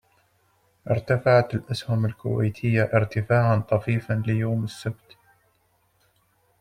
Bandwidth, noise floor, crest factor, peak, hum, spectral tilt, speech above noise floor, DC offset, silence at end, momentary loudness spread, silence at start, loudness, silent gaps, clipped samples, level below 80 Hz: 10.5 kHz; -66 dBFS; 18 dB; -6 dBFS; none; -8 dB/octave; 44 dB; under 0.1%; 1.7 s; 10 LU; 0.85 s; -24 LUFS; none; under 0.1%; -56 dBFS